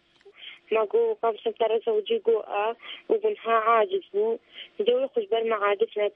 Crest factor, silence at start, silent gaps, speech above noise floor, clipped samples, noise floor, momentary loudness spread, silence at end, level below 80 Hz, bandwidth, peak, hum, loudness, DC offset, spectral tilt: 16 dB; 0.25 s; none; 23 dB; under 0.1%; -48 dBFS; 9 LU; 0.05 s; -84 dBFS; 3.8 kHz; -10 dBFS; none; -25 LUFS; under 0.1%; -6.5 dB/octave